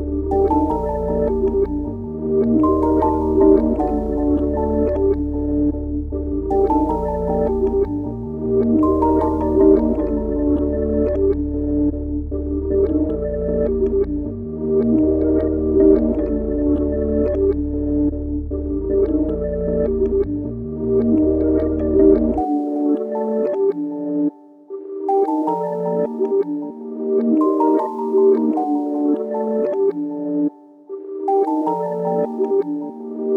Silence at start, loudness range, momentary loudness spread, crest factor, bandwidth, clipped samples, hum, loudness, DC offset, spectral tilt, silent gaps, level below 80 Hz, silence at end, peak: 0 s; 4 LU; 9 LU; 16 dB; 2.7 kHz; under 0.1%; none; -19 LUFS; under 0.1%; -11.5 dB/octave; none; -30 dBFS; 0 s; -2 dBFS